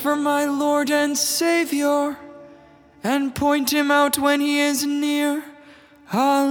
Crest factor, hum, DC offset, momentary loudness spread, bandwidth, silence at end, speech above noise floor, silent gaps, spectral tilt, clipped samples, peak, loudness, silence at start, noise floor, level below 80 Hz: 16 dB; none; under 0.1%; 6 LU; over 20 kHz; 0 s; 29 dB; none; -3 dB/octave; under 0.1%; -4 dBFS; -20 LUFS; 0 s; -49 dBFS; -60 dBFS